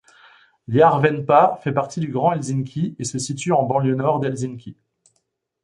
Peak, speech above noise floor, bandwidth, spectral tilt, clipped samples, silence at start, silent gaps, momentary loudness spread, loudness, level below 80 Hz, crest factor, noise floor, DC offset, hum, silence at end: -2 dBFS; 53 dB; 11.5 kHz; -6 dB/octave; under 0.1%; 0.7 s; none; 10 LU; -20 LUFS; -60 dBFS; 20 dB; -72 dBFS; under 0.1%; none; 0.9 s